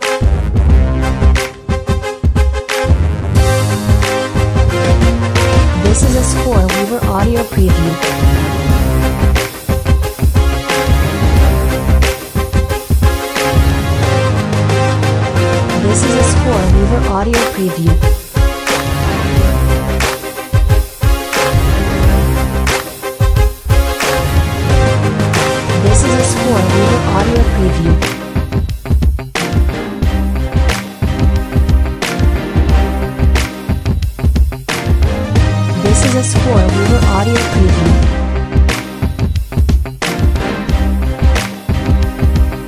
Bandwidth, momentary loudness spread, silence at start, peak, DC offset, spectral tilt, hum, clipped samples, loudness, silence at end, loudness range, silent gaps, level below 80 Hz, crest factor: 16 kHz; 5 LU; 0 s; 0 dBFS; under 0.1%; -5.5 dB/octave; none; under 0.1%; -13 LUFS; 0 s; 3 LU; none; -14 dBFS; 12 dB